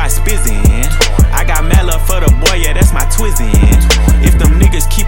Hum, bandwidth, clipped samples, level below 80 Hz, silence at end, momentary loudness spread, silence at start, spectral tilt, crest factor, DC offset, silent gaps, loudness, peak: none; 17.5 kHz; under 0.1%; -10 dBFS; 0 s; 5 LU; 0 s; -4.5 dB/octave; 8 dB; under 0.1%; none; -11 LUFS; 0 dBFS